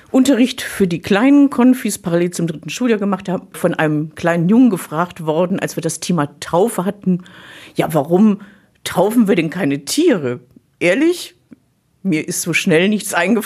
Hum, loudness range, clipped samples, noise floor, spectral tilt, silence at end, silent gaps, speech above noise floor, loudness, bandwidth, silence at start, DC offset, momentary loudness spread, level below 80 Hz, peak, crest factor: none; 3 LU; under 0.1%; -59 dBFS; -5.5 dB/octave; 0 s; none; 43 dB; -16 LUFS; 15 kHz; 0.15 s; under 0.1%; 10 LU; -56 dBFS; -2 dBFS; 14 dB